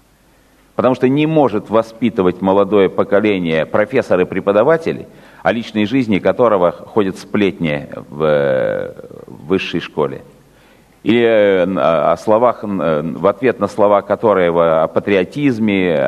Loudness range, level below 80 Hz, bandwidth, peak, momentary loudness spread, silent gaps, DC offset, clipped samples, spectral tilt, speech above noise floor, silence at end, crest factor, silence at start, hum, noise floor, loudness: 4 LU; -52 dBFS; 12 kHz; 0 dBFS; 8 LU; none; under 0.1%; under 0.1%; -7.5 dB/octave; 37 dB; 0 s; 14 dB; 0.8 s; none; -51 dBFS; -15 LUFS